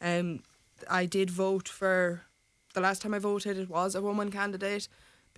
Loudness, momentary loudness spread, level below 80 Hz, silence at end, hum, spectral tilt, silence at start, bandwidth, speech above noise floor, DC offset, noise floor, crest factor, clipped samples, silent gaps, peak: -31 LUFS; 9 LU; -70 dBFS; 0.5 s; none; -5 dB/octave; 0 s; 11 kHz; 23 dB; under 0.1%; -53 dBFS; 20 dB; under 0.1%; none; -12 dBFS